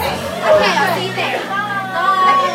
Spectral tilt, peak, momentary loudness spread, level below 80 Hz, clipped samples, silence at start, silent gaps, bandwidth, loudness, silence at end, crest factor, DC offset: -4 dB/octave; 0 dBFS; 7 LU; -48 dBFS; under 0.1%; 0 s; none; 16 kHz; -15 LUFS; 0 s; 16 dB; under 0.1%